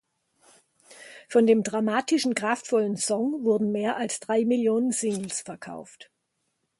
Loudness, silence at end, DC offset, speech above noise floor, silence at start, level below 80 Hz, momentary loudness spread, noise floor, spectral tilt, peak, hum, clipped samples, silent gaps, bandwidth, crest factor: -25 LUFS; 0.75 s; under 0.1%; 52 dB; 0.9 s; -74 dBFS; 16 LU; -77 dBFS; -4 dB/octave; -8 dBFS; none; under 0.1%; none; 11.5 kHz; 18 dB